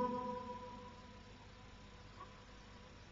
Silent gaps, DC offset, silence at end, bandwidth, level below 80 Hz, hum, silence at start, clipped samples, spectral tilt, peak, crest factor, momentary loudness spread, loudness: none; under 0.1%; 0 s; 7.4 kHz; -64 dBFS; 50 Hz at -60 dBFS; 0 s; under 0.1%; -5 dB/octave; -28 dBFS; 20 dB; 13 LU; -51 LUFS